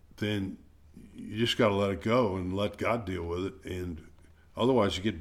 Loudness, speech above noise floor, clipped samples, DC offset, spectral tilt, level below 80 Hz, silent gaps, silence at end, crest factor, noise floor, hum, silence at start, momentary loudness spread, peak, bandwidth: -30 LUFS; 23 dB; under 0.1%; under 0.1%; -6 dB/octave; -54 dBFS; none; 0 s; 18 dB; -53 dBFS; none; 0.2 s; 14 LU; -12 dBFS; 16 kHz